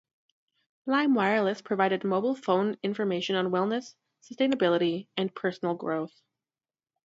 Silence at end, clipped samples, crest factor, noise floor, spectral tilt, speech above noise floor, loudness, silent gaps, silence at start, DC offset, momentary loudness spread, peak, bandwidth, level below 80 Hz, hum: 1 s; under 0.1%; 20 dB; under -90 dBFS; -6 dB/octave; over 63 dB; -28 LUFS; none; 0.85 s; under 0.1%; 8 LU; -10 dBFS; 7.8 kHz; -78 dBFS; none